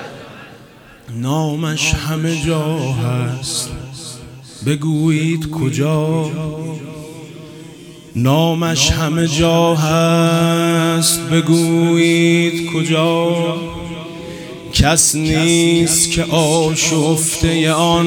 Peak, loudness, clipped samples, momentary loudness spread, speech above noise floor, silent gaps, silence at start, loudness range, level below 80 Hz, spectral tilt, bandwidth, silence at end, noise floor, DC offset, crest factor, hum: 0 dBFS; -15 LUFS; under 0.1%; 18 LU; 27 dB; none; 0 s; 6 LU; -36 dBFS; -4.5 dB/octave; 19.5 kHz; 0 s; -41 dBFS; under 0.1%; 16 dB; none